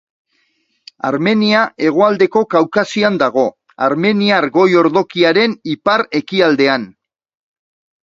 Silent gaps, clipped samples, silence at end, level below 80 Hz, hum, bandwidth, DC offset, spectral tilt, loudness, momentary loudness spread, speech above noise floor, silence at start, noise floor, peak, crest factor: none; under 0.1%; 1.1 s; -60 dBFS; none; 7.8 kHz; under 0.1%; -6 dB/octave; -14 LUFS; 7 LU; 49 dB; 1.05 s; -63 dBFS; 0 dBFS; 14 dB